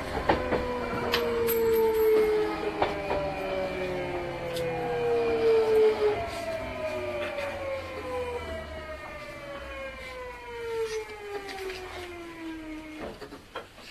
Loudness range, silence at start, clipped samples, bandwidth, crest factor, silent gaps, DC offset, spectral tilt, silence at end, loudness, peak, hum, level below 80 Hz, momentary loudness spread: 10 LU; 0 s; under 0.1%; 14 kHz; 20 dB; none; under 0.1%; -5 dB/octave; 0 s; -29 LUFS; -8 dBFS; none; -48 dBFS; 16 LU